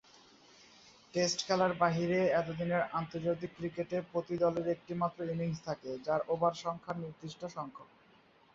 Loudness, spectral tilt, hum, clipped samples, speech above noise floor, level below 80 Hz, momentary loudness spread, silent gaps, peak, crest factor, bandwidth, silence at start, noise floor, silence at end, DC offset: -34 LUFS; -5 dB/octave; none; under 0.1%; 30 dB; -68 dBFS; 12 LU; none; -16 dBFS; 20 dB; 7.6 kHz; 1.15 s; -64 dBFS; 0.7 s; under 0.1%